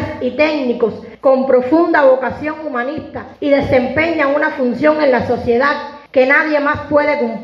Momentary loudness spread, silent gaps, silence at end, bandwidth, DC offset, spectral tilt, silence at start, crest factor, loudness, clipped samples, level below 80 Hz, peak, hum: 9 LU; none; 0 s; 6.8 kHz; under 0.1%; -7 dB/octave; 0 s; 14 dB; -14 LUFS; under 0.1%; -46 dBFS; 0 dBFS; none